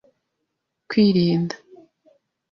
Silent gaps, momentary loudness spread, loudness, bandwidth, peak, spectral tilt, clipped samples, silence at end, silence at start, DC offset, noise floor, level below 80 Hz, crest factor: none; 13 LU; -20 LUFS; 7 kHz; -6 dBFS; -7.5 dB/octave; under 0.1%; 0.95 s; 0.9 s; under 0.1%; -78 dBFS; -62 dBFS; 16 dB